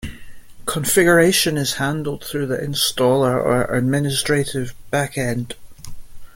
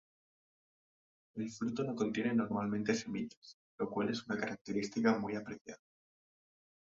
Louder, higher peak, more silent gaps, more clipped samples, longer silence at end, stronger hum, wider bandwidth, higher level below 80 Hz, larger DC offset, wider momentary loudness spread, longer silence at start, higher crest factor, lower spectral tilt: first, -19 LUFS vs -37 LUFS; first, -2 dBFS vs -18 dBFS; second, none vs 3.37-3.42 s, 3.54-3.78 s, 4.61-4.65 s, 5.61-5.65 s; neither; second, 0.05 s vs 1.05 s; neither; first, 17 kHz vs 7.6 kHz; first, -44 dBFS vs -74 dBFS; neither; about the same, 13 LU vs 15 LU; second, 0 s vs 1.35 s; about the same, 18 dB vs 22 dB; about the same, -4 dB/octave vs -5 dB/octave